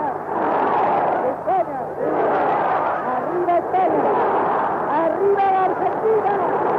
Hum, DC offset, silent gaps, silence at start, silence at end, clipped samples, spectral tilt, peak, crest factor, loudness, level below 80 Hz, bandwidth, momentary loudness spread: none; under 0.1%; none; 0 s; 0 s; under 0.1%; -8 dB/octave; -8 dBFS; 10 dB; -19 LUFS; -60 dBFS; 6 kHz; 4 LU